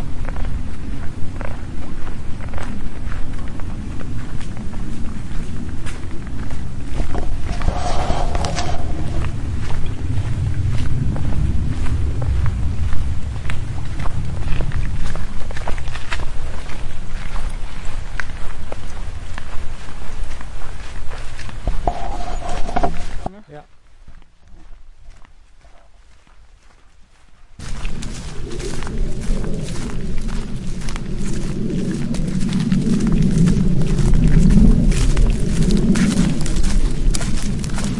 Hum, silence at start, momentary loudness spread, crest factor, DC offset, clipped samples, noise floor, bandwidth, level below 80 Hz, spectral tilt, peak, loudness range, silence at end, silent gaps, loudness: none; 0 s; 15 LU; 14 dB; under 0.1%; under 0.1%; -44 dBFS; 11.5 kHz; -22 dBFS; -6.5 dB/octave; -2 dBFS; 15 LU; 0 s; none; -23 LUFS